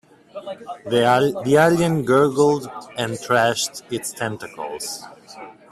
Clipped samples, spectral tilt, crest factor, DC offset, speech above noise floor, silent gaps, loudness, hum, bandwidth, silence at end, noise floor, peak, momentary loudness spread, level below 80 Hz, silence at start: under 0.1%; -4.5 dB/octave; 18 dB; under 0.1%; 21 dB; none; -19 LUFS; none; 14.5 kHz; 0.2 s; -41 dBFS; -2 dBFS; 20 LU; -58 dBFS; 0.35 s